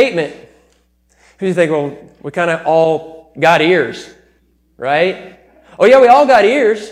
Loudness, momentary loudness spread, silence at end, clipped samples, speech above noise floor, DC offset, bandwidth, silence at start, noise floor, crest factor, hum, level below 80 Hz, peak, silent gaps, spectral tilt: -12 LUFS; 17 LU; 0 s; under 0.1%; 44 dB; under 0.1%; 11.5 kHz; 0 s; -56 dBFS; 14 dB; none; -54 dBFS; 0 dBFS; none; -5.5 dB/octave